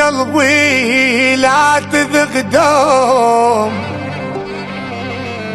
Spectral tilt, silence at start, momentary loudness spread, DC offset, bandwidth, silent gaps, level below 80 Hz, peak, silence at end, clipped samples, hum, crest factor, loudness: -3.5 dB/octave; 0 s; 12 LU; under 0.1%; 12.5 kHz; none; -50 dBFS; 0 dBFS; 0 s; under 0.1%; none; 12 dB; -12 LUFS